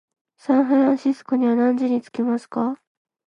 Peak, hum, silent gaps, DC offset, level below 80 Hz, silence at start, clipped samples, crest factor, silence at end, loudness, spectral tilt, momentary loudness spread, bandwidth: -6 dBFS; none; none; under 0.1%; -74 dBFS; 0.5 s; under 0.1%; 14 dB; 0.5 s; -21 LUFS; -7 dB/octave; 8 LU; 9.2 kHz